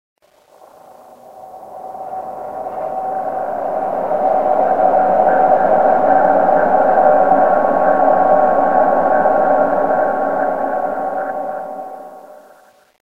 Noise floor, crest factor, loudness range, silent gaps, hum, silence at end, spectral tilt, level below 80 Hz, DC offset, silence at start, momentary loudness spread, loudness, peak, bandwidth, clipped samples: -48 dBFS; 16 dB; 11 LU; none; none; 0.05 s; -8 dB/octave; -58 dBFS; 1%; 0.15 s; 15 LU; -14 LUFS; 0 dBFS; 4.3 kHz; under 0.1%